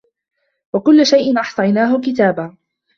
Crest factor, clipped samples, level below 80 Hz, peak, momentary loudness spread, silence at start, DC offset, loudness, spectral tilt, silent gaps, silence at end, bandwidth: 14 dB; under 0.1%; -60 dBFS; -2 dBFS; 13 LU; 0.75 s; under 0.1%; -14 LUFS; -5.5 dB/octave; none; 0.45 s; 7.4 kHz